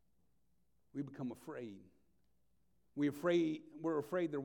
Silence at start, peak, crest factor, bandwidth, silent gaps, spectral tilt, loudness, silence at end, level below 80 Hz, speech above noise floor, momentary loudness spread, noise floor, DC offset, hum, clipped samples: 0.95 s; -24 dBFS; 18 dB; 18 kHz; none; -7 dB/octave; -40 LUFS; 0 s; -84 dBFS; 42 dB; 16 LU; -81 dBFS; under 0.1%; none; under 0.1%